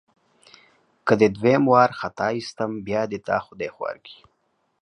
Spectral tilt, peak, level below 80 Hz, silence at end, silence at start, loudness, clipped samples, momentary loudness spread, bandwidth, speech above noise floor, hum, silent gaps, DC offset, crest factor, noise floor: -6.5 dB/octave; -2 dBFS; -60 dBFS; 0.7 s; 1.05 s; -22 LUFS; under 0.1%; 15 LU; 10.5 kHz; 48 dB; none; none; under 0.1%; 22 dB; -70 dBFS